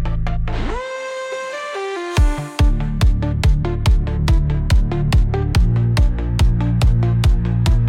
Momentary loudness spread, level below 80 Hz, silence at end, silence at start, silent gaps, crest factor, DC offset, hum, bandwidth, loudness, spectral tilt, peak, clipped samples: 9 LU; -18 dBFS; 0 s; 0 s; none; 10 dB; under 0.1%; none; 12 kHz; -19 LUFS; -6.5 dB/octave; -6 dBFS; under 0.1%